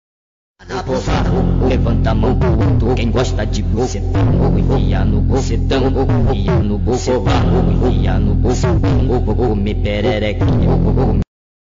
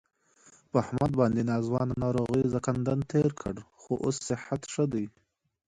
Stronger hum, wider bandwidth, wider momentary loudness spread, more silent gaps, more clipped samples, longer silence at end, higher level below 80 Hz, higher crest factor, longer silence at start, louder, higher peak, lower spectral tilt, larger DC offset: neither; second, 7.6 kHz vs 11 kHz; second, 4 LU vs 9 LU; neither; neither; second, 0.45 s vs 0.6 s; first, -20 dBFS vs -54 dBFS; second, 6 dB vs 18 dB; about the same, 0.65 s vs 0.75 s; first, -16 LUFS vs -29 LUFS; first, -8 dBFS vs -12 dBFS; about the same, -7.5 dB/octave vs -7 dB/octave; neither